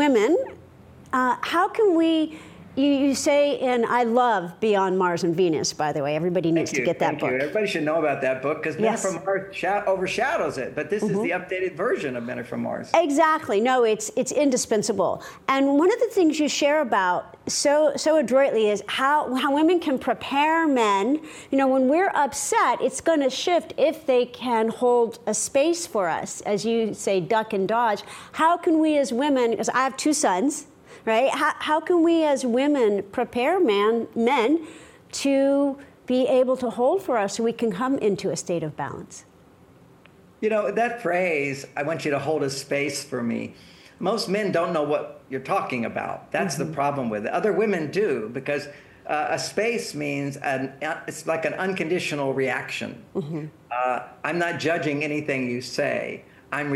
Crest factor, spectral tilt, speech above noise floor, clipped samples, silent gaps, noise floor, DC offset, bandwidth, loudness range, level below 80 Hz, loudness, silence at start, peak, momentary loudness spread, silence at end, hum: 18 dB; -4.5 dB/octave; 30 dB; under 0.1%; none; -52 dBFS; under 0.1%; 16 kHz; 5 LU; -64 dBFS; -23 LUFS; 0 s; -6 dBFS; 9 LU; 0 s; none